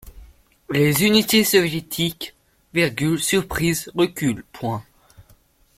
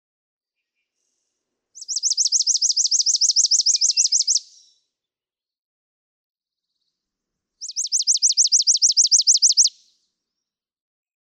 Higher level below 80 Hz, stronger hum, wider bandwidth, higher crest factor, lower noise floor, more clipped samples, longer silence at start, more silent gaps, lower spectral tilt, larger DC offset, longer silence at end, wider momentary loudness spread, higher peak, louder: first, -48 dBFS vs under -90 dBFS; neither; second, 16.5 kHz vs 19.5 kHz; about the same, 20 dB vs 16 dB; second, -56 dBFS vs under -90 dBFS; neither; second, 0.05 s vs 1.75 s; second, none vs 5.58-6.35 s; first, -4 dB/octave vs 10.5 dB/octave; neither; second, 0.55 s vs 1.7 s; first, 13 LU vs 9 LU; first, -2 dBFS vs -6 dBFS; second, -20 LUFS vs -15 LUFS